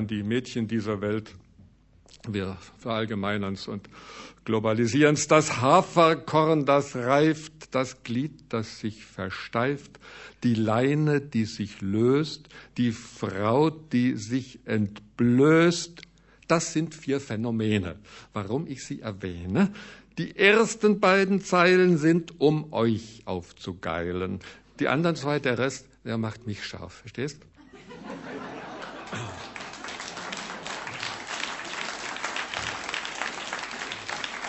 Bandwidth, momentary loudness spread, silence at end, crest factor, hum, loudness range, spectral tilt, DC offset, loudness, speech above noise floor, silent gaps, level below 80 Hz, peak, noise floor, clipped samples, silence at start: 8.4 kHz; 17 LU; 0 s; 24 dB; none; 12 LU; -5.5 dB/octave; under 0.1%; -26 LUFS; 30 dB; none; -60 dBFS; -4 dBFS; -55 dBFS; under 0.1%; 0 s